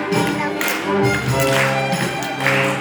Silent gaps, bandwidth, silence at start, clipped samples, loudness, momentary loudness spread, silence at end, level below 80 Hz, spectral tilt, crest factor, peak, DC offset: none; over 20 kHz; 0 s; under 0.1%; -18 LUFS; 4 LU; 0 s; -46 dBFS; -4.5 dB/octave; 18 dB; -2 dBFS; under 0.1%